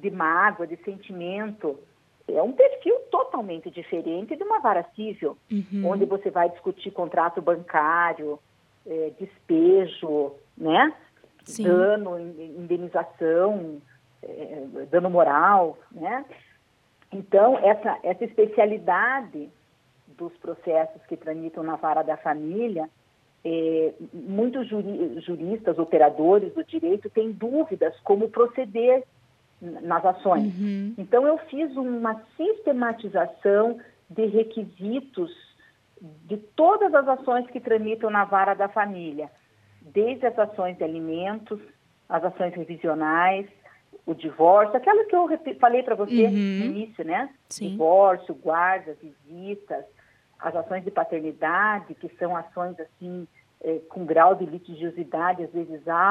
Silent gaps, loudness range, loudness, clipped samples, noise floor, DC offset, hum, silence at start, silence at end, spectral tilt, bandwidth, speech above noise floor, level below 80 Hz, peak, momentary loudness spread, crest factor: none; 6 LU; -24 LUFS; under 0.1%; -63 dBFS; under 0.1%; none; 0 s; 0 s; -6.5 dB/octave; 11.5 kHz; 39 dB; -76 dBFS; -4 dBFS; 16 LU; 20 dB